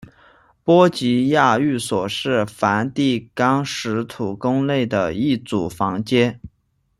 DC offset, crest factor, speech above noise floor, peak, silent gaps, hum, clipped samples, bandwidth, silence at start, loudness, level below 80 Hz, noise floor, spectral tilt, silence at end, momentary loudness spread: under 0.1%; 18 dB; 48 dB; -2 dBFS; none; none; under 0.1%; 13 kHz; 0 s; -19 LUFS; -54 dBFS; -66 dBFS; -5.5 dB/octave; 0.5 s; 8 LU